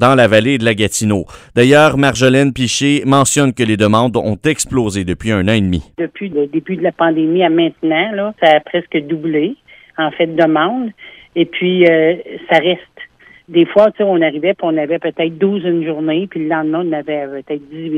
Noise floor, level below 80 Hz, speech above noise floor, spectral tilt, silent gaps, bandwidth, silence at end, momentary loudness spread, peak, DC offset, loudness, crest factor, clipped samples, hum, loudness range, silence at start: -38 dBFS; -44 dBFS; 24 dB; -5 dB/octave; none; 16 kHz; 0 s; 10 LU; 0 dBFS; under 0.1%; -14 LUFS; 14 dB; under 0.1%; none; 4 LU; 0 s